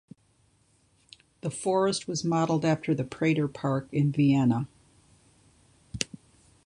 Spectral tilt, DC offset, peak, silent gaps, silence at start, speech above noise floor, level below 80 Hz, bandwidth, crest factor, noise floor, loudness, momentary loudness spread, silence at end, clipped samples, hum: -6 dB/octave; under 0.1%; -6 dBFS; none; 1.45 s; 40 dB; -60 dBFS; 11 kHz; 22 dB; -66 dBFS; -27 LUFS; 11 LU; 0.6 s; under 0.1%; none